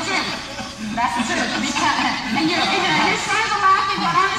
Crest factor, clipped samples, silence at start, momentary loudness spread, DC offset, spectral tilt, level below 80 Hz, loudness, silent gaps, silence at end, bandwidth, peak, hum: 16 dB; under 0.1%; 0 s; 9 LU; under 0.1%; -2.5 dB/octave; -48 dBFS; -19 LUFS; none; 0 s; 14.5 kHz; -4 dBFS; none